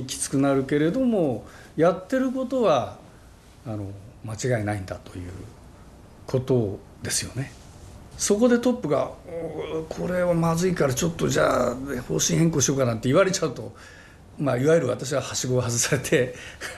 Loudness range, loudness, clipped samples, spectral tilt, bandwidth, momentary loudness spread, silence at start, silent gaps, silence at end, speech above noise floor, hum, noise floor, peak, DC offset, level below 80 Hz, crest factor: 7 LU; -24 LUFS; under 0.1%; -5 dB/octave; 13 kHz; 16 LU; 0 s; none; 0 s; 25 dB; none; -49 dBFS; -8 dBFS; under 0.1%; -50 dBFS; 18 dB